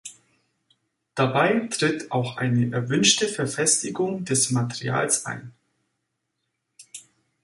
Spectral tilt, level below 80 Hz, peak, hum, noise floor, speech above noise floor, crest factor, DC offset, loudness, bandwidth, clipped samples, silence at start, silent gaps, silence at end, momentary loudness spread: -3.5 dB/octave; -64 dBFS; -4 dBFS; none; -78 dBFS; 55 dB; 22 dB; under 0.1%; -22 LUFS; 11.5 kHz; under 0.1%; 0.05 s; none; 0.45 s; 18 LU